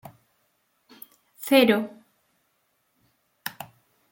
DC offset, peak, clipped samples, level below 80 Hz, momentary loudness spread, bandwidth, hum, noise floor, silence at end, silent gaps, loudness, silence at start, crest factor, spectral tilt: under 0.1%; -6 dBFS; under 0.1%; -74 dBFS; 29 LU; 17 kHz; none; -71 dBFS; 0.45 s; none; -23 LUFS; 1.4 s; 22 dB; -4 dB/octave